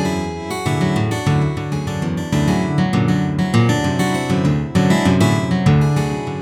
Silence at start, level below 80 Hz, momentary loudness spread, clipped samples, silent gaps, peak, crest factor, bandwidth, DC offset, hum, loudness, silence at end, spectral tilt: 0 s; -38 dBFS; 7 LU; under 0.1%; none; -2 dBFS; 14 dB; 15 kHz; under 0.1%; none; -17 LUFS; 0 s; -6.5 dB/octave